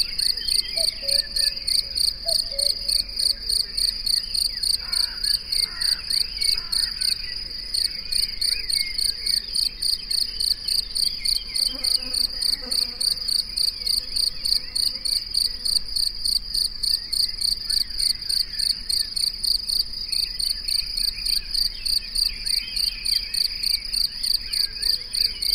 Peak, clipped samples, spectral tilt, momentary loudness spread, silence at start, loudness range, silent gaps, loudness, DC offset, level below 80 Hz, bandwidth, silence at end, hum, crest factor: -6 dBFS; under 0.1%; 1 dB/octave; 3 LU; 0 s; 1 LU; none; -21 LUFS; under 0.1%; -40 dBFS; 16 kHz; 0 s; none; 18 dB